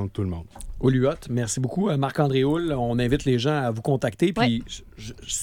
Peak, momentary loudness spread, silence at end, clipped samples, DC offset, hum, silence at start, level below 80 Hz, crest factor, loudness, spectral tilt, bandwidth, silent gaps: -8 dBFS; 15 LU; 0 s; under 0.1%; under 0.1%; none; 0 s; -42 dBFS; 16 dB; -24 LUFS; -5.5 dB/octave; 16 kHz; none